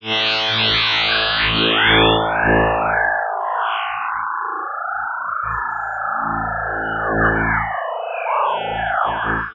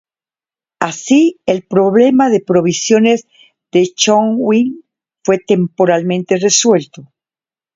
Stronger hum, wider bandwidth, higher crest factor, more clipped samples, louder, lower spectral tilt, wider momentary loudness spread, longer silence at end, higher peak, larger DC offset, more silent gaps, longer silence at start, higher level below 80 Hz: neither; about the same, 7.2 kHz vs 7.8 kHz; about the same, 18 dB vs 14 dB; neither; second, -18 LUFS vs -13 LUFS; about the same, -5.5 dB/octave vs -4.5 dB/octave; about the same, 9 LU vs 8 LU; second, 0 s vs 0.7 s; about the same, 0 dBFS vs 0 dBFS; neither; neither; second, 0 s vs 0.8 s; first, -38 dBFS vs -60 dBFS